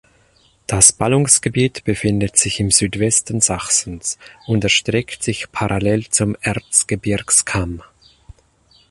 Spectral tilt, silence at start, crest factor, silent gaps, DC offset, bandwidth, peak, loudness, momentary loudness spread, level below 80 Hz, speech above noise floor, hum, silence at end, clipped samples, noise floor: -3 dB/octave; 0.7 s; 18 dB; none; under 0.1%; 13.5 kHz; 0 dBFS; -16 LUFS; 11 LU; -40 dBFS; 38 dB; none; 1.1 s; under 0.1%; -55 dBFS